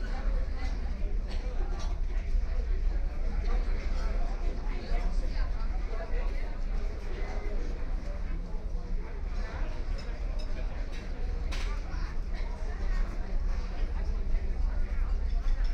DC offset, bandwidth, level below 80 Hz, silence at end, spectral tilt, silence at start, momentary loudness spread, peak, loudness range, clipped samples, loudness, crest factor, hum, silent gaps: under 0.1%; 6.6 kHz; -30 dBFS; 0 s; -6.5 dB/octave; 0 s; 4 LU; -18 dBFS; 3 LU; under 0.1%; -37 LUFS; 12 dB; none; none